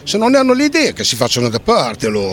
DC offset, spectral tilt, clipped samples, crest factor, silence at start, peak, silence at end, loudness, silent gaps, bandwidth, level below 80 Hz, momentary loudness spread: under 0.1%; -4 dB/octave; under 0.1%; 14 dB; 0.05 s; 0 dBFS; 0 s; -14 LUFS; none; 18.5 kHz; -44 dBFS; 4 LU